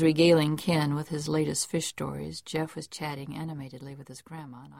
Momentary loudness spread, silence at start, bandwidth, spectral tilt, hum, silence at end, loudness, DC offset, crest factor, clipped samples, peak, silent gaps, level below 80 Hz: 21 LU; 0 s; 16 kHz; -5 dB/octave; none; 0 s; -28 LUFS; under 0.1%; 18 dB; under 0.1%; -10 dBFS; none; -60 dBFS